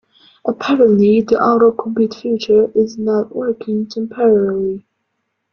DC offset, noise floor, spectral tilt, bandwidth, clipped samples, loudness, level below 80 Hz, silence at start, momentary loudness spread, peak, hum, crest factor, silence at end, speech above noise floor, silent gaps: under 0.1%; -71 dBFS; -7.5 dB/octave; 6.8 kHz; under 0.1%; -15 LUFS; -56 dBFS; 0.45 s; 10 LU; -2 dBFS; none; 14 dB; 0.75 s; 57 dB; none